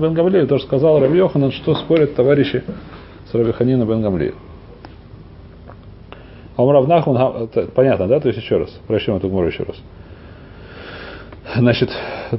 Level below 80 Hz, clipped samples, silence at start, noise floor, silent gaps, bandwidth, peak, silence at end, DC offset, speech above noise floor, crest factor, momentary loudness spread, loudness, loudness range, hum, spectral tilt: -42 dBFS; under 0.1%; 0 s; -38 dBFS; none; 5.8 kHz; 0 dBFS; 0 s; under 0.1%; 23 dB; 16 dB; 20 LU; -16 LUFS; 6 LU; none; -12 dB/octave